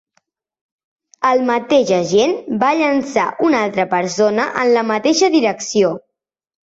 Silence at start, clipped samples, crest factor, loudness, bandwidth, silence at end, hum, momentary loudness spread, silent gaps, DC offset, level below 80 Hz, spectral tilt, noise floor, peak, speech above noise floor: 1.2 s; under 0.1%; 14 dB; -16 LUFS; 8 kHz; 0.75 s; none; 4 LU; none; under 0.1%; -60 dBFS; -4 dB/octave; -79 dBFS; -2 dBFS; 64 dB